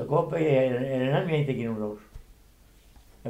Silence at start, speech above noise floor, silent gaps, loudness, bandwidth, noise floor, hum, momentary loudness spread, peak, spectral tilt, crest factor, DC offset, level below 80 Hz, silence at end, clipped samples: 0 s; 30 dB; none; -26 LUFS; 14.5 kHz; -56 dBFS; none; 11 LU; -12 dBFS; -8 dB/octave; 16 dB; under 0.1%; -54 dBFS; 0 s; under 0.1%